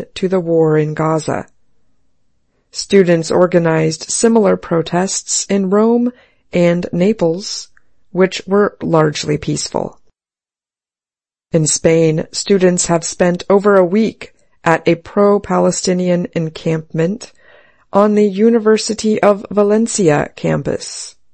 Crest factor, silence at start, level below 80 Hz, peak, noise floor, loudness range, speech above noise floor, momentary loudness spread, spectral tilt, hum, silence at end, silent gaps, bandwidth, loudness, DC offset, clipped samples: 14 dB; 0 s; -48 dBFS; 0 dBFS; under -90 dBFS; 4 LU; over 76 dB; 9 LU; -5 dB/octave; none; 0.25 s; none; 8.8 kHz; -14 LUFS; under 0.1%; under 0.1%